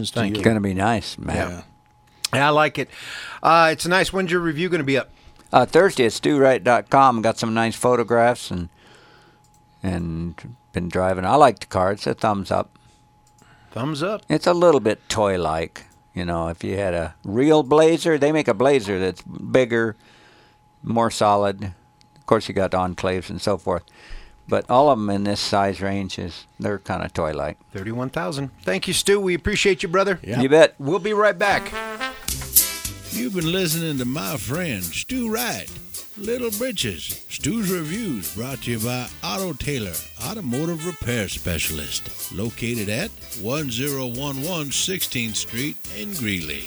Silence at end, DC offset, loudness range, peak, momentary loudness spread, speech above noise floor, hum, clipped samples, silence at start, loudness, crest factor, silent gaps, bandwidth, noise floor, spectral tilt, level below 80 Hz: 0 s; under 0.1%; 7 LU; 0 dBFS; 13 LU; 34 dB; none; under 0.1%; 0 s; -21 LUFS; 22 dB; none; over 20 kHz; -55 dBFS; -4.5 dB/octave; -46 dBFS